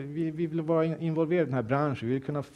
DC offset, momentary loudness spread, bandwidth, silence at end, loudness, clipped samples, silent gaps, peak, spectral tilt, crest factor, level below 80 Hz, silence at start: under 0.1%; 5 LU; 9.2 kHz; 0.05 s; -29 LUFS; under 0.1%; none; -12 dBFS; -9 dB/octave; 16 dB; -66 dBFS; 0 s